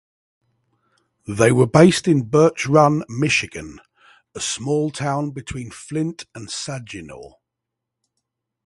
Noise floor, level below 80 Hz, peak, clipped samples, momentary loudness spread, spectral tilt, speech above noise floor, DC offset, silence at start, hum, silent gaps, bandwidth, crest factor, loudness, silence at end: -82 dBFS; -52 dBFS; 0 dBFS; under 0.1%; 21 LU; -5.5 dB/octave; 63 dB; under 0.1%; 1.3 s; none; none; 11.5 kHz; 20 dB; -18 LUFS; 1.35 s